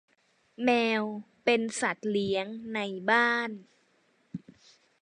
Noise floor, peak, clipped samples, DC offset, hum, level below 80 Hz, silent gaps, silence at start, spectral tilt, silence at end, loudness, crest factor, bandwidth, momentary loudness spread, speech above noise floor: -69 dBFS; -10 dBFS; under 0.1%; under 0.1%; none; -74 dBFS; none; 0.6 s; -4 dB/octave; 0.65 s; -28 LUFS; 20 dB; 11.5 kHz; 20 LU; 40 dB